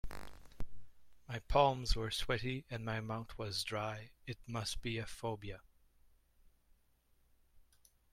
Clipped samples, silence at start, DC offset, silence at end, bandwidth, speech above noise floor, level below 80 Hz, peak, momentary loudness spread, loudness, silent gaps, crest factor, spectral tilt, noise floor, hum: under 0.1%; 0.05 s; under 0.1%; 0.55 s; 15.5 kHz; 34 dB; -50 dBFS; -16 dBFS; 22 LU; -39 LUFS; none; 24 dB; -4.5 dB/octave; -72 dBFS; none